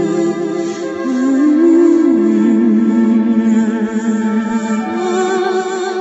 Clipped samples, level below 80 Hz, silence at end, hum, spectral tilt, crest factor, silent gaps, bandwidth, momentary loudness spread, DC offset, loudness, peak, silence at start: under 0.1%; -60 dBFS; 0 s; none; -6.5 dB/octave; 10 dB; none; 8 kHz; 8 LU; under 0.1%; -14 LUFS; -2 dBFS; 0 s